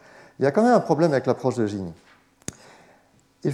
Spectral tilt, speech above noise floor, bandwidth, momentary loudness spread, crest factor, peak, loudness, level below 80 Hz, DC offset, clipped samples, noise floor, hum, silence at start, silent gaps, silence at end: -7 dB/octave; 38 dB; 13.5 kHz; 20 LU; 20 dB; -4 dBFS; -22 LUFS; -68 dBFS; under 0.1%; under 0.1%; -59 dBFS; none; 0.4 s; none; 0 s